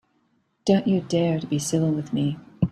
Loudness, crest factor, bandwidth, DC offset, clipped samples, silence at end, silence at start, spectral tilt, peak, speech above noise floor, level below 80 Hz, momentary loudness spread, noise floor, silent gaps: -24 LUFS; 18 dB; 14 kHz; under 0.1%; under 0.1%; 0 s; 0.65 s; -6.5 dB/octave; -6 dBFS; 45 dB; -54 dBFS; 6 LU; -68 dBFS; none